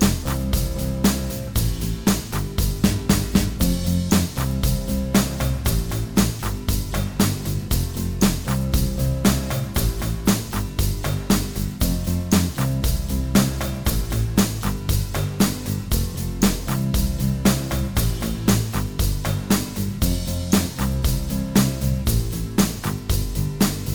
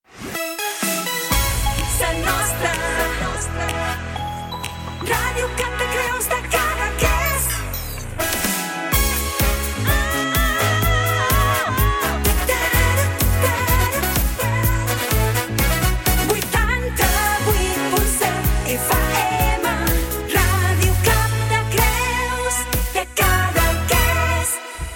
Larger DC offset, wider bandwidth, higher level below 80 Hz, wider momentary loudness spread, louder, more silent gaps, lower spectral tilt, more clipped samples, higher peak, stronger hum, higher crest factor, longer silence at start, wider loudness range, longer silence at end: first, 0.6% vs under 0.1%; first, over 20 kHz vs 17 kHz; about the same, -28 dBFS vs -26 dBFS; about the same, 5 LU vs 6 LU; second, -22 LUFS vs -19 LUFS; neither; first, -5 dB/octave vs -3.5 dB/octave; neither; about the same, -4 dBFS vs -4 dBFS; neither; about the same, 18 dB vs 16 dB; second, 0 s vs 0.15 s; second, 1 LU vs 4 LU; about the same, 0 s vs 0 s